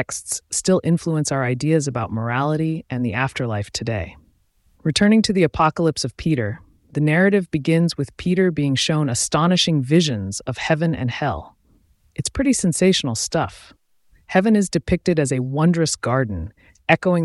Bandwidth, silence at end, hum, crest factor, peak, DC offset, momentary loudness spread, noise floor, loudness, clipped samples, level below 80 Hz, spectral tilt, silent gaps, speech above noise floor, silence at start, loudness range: 12 kHz; 0 s; none; 18 dB; -2 dBFS; under 0.1%; 10 LU; -60 dBFS; -20 LUFS; under 0.1%; -44 dBFS; -5 dB/octave; none; 41 dB; 0 s; 3 LU